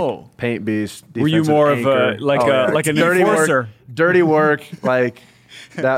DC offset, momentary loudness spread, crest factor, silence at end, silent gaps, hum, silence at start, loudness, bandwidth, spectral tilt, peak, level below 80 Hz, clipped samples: under 0.1%; 10 LU; 12 dB; 0 s; none; none; 0 s; -17 LUFS; 16 kHz; -5.5 dB/octave; -4 dBFS; -60 dBFS; under 0.1%